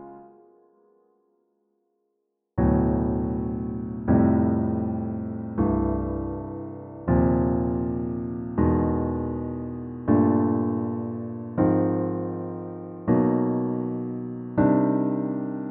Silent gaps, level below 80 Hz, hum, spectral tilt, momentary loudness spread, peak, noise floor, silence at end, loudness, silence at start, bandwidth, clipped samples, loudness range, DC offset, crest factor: none; -40 dBFS; none; -12 dB/octave; 12 LU; -8 dBFS; -77 dBFS; 0 s; -25 LUFS; 0 s; 2.9 kHz; under 0.1%; 2 LU; under 0.1%; 18 dB